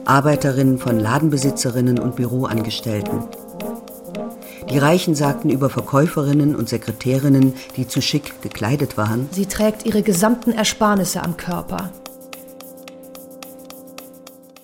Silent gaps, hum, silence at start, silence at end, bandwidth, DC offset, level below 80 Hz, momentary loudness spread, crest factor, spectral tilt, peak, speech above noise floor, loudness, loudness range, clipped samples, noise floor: none; none; 0 s; 0.35 s; 17 kHz; under 0.1%; -48 dBFS; 21 LU; 18 dB; -5.5 dB/octave; -2 dBFS; 25 dB; -19 LUFS; 5 LU; under 0.1%; -42 dBFS